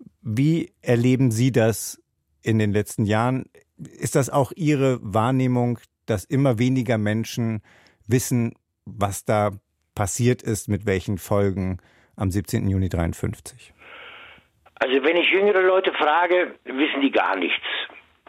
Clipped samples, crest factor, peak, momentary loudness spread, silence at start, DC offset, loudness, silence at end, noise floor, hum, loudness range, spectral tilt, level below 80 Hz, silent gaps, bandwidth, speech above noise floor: under 0.1%; 16 dB; -6 dBFS; 12 LU; 0 s; under 0.1%; -22 LUFS; 0.3 s; -52 dBFS; none; 5 LU; -5.5 dB/octave; -50 dBFS; none; 16 kHz; 30 dB